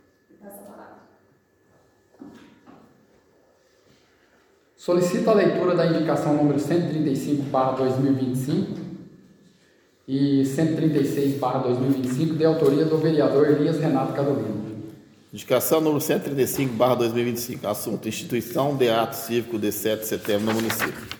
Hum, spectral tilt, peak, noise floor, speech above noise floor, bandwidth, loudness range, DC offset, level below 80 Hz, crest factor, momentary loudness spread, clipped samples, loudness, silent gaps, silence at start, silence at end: none; -6 dB/octave; -6 dBFS; -61 dBFS; 39 dB; 19 kHz; 4 LU; under 0.1%; -64 dBFS; 18 dB; 10 LU; under 0.1%; -23 LUFS; none; 0.45 s; 0 s